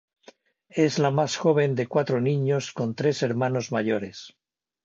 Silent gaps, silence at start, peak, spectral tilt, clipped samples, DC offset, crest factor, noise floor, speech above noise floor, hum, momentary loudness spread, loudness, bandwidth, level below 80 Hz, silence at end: none; 0.75 s; -8 dBFS; -6 dB/octave; under 0.1%; under 0.1%; 18 dB; -55 dBFS; 31 dB; none; 8 LU; -25 LUFS; 7.8 kHz; -68 dBFS; 0.55 s